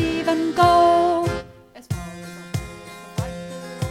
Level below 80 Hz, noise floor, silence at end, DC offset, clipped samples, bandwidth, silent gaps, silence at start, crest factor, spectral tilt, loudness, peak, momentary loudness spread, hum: -42 dBFS; -42 dBFS; 0 s; under 0.1%; under 0.1%; 16 kHz; none; 0 s; 18 dB; -6 dB/octave; -21 LUFS; -4 dBFS; 20 LU; none